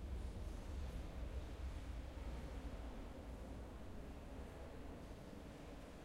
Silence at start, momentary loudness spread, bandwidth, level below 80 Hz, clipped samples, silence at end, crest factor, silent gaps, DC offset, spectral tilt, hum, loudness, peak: 0 s; 5 LU; 16 kHz; -52 dBFS; under 0.1%; 0 s; 12 dB; none; under 0.1%; -6.5 dB/octave; none; -52 LUFS; -36 dBFS